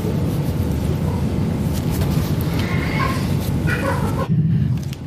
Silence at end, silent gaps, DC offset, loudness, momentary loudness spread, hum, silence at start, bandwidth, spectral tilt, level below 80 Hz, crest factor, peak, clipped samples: 0 s; none; under 0.1%; -20 LUFS; 3 LU; none; 0 s; 15.5 kHz; -7 dB/octave; -30 dBFS; 12 dB; -6 dBFS; under 0.1%